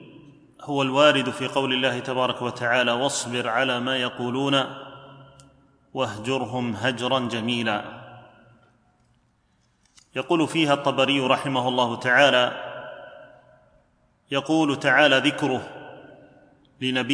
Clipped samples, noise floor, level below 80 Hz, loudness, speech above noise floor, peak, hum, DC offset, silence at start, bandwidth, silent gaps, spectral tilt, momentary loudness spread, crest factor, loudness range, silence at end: under 0.1%; -65 dBFS; -68 dBFS; -22 LUFS; 43 dB; -2 dBFS; none; under 0.1%; 0 s; 10.5 kHz; none; -4 dB/octave; 18 LU; 22 dB; 7 LU; 0 s